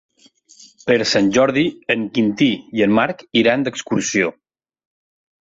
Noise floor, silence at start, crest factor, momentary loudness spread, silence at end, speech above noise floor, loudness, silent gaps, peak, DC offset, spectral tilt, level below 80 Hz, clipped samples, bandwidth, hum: -52 dBFS; 0.85 s; 16 dB; 6 LU; 1.1 s; 35 dB; -17 LUFS; none; -2 dBFS; under 0.1%; -4.5 dB/octave; -56 dBFS; under 0.1%; 8 kHz; none